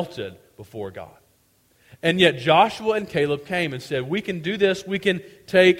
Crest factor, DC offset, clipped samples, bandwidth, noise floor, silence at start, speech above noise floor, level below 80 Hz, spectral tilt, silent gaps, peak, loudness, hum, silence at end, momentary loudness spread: 20 dB; under 0.1%; under 0.1%; 16 kHz; -62 dBFS; 0 s; 40 dB; -60 dBFS; -5.5 dB/octave; none; -2 dBFS; -21 LUFS; none; 0 s; 17 LU